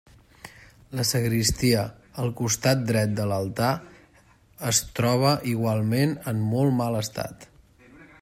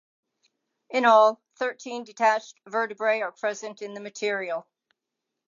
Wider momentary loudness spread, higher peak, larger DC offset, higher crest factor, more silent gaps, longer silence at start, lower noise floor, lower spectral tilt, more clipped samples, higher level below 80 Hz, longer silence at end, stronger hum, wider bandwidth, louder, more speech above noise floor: second, 11 LU vs 17 LU; about the same, -6 dBFS vs -6 dBFS; neither; about the same, 18 dB vs 20 dB; neither; second, 0.45 s vs 0.9 s; second, -57 dBFS vs -85 dBFS; first, -5 dB/octave vs -3 dB/octave; neither; first, -50 dBFS vs -90 dBFS; second, 0.15 s vs 0.9 s; neither; first, 16 kHz vs 7.4 kHz; about the same, -24 LUFS vs -25 LUFS; second, 33 dB vs 60 dB